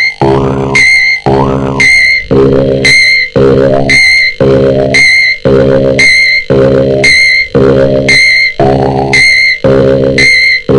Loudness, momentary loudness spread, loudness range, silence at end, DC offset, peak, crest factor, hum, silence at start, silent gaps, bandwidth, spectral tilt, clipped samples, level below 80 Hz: -5 LUFS; 5 LU; 1 LU; 0 s; 1%; 0 dBFS; 6 dB; none; 0 s; none; 12 kHz; -4.5 dB/octave; 1%; -28 dBFS